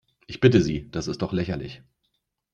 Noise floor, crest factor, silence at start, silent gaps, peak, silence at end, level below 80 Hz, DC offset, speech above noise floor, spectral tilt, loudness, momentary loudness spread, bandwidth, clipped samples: -76 dBFS; 22 dB; 0.3 s; none; -4 dBFS; 0.8 s; -48 dBFS; under 0.1%; 53 dB; -6.5 dB/octave; -24 LUFS; 17 LU; 8.6 kHz; under 0.1%